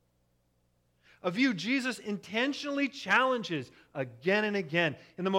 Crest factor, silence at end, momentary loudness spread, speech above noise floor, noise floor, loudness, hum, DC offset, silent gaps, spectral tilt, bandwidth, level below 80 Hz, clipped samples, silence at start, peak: 20 dB; 0 s; 11 LU; 42 dB; -73 dBFS; -30 LUFS; 60 Hz at -65 dBFS; under 0.1%; none; -5 dB/octave; 13.5 kHz; -76 dBFS; under 0.1%; 1.25 s; -12 dBFS